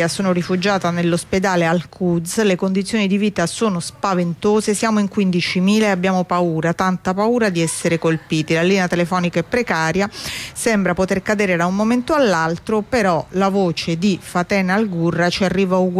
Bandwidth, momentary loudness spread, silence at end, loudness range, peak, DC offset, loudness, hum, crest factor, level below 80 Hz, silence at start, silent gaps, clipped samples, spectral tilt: 14.5 kHz; 4 LU; 0 s; 1 LU; -6 dBFS; under 0.1%; -18 LUFS; none; 12 dB; -48 dBFS; 0 s; none; under 0.1%; -5.5 dB/octave